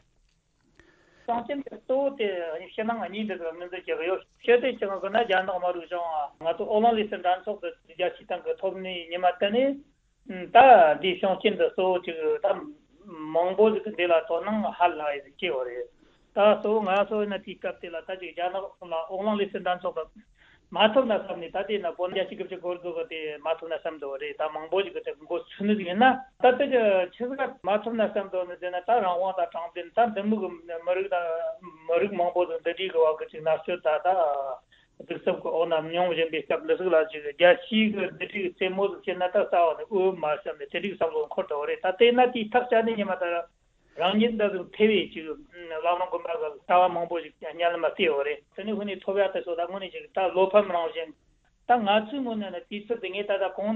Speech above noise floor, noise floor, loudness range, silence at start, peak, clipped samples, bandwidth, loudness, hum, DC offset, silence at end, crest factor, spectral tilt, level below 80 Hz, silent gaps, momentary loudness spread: 42 dB; -67 dBFS; 7 LU; 1.3 s; -4 dBFS; under 0.1%; 4.2 kHz; -26 LUFS; none; under 0.1%; 0 s; 22 dB; -7.5 dB/octave; -66 dBFS; none; 12 LU